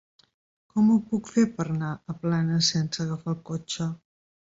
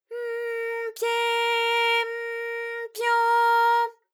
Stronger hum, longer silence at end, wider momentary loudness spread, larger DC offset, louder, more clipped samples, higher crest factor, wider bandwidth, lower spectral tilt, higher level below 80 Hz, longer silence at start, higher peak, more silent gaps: neither; first, 0.65 s vs 0.2 s; about the same, 11 LU vs 11 LU; neither; about the same, -26 LUFS vs -24 LUFS; neither; about the same, 16 dB vs 12 dB; second, 7.8 kHz vs 18.5 kHz; first, -5.5 dB/octave vs 4 dB/octave; first, -62 dBFS vs under -90 dBFS; first, 0.75 s vs 0.1 s; about the same, -10 dBFS vs -12 dBFS; neither